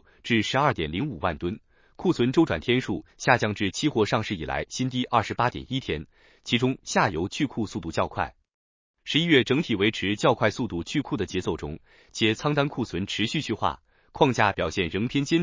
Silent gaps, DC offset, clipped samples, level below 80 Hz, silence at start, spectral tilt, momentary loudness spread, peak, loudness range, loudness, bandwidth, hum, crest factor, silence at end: 8.54-8.94 s; under 0.1%; under 0.1%; -48 dBFS; 0.25 s; -5 dB/octave; 9 LU; -4 dBFS; 3 LU; -26 LUFS; 7.6 kHz; none; 22 dB; 0 s